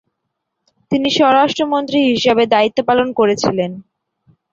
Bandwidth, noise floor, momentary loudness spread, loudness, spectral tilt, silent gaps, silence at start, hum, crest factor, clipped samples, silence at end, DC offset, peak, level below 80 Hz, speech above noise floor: 7.8 kHz; -75 dBFS; 9 LU; -15 LUFS; -4.5 dB/octave; none; 0.9 s; none; 14 dB; under 0.1%; 0.7 s; under 0.1%; -2 dBFS; -54 dBFS; 61 dB